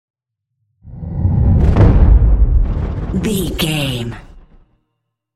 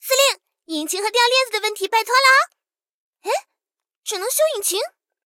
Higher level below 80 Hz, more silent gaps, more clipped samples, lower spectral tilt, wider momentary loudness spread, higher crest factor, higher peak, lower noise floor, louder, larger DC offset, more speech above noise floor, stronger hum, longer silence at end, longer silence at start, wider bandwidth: first, -16 dBFS vs -78 dBFS; second, none vs 2.91-3.13 s, 3.99-4.03 s; neither; first, -6.5 dB/octave vs 2.5 dB/octave; about the same, 14 LU vs 15 LU; about the same, 14 dB vs 18 dB; about the same, 0 dBFS vs -2 dBFS; second, -73 dBFS vs -87 dBFS; first, -15 LUFS vs -18 LUFS; neither; second, 55 dB vs 68 dB; neither; first, 0.95 s vs 0.4 s; first, 0.85 s vs 0.05 s; second, 14 kHz vs 17 kHz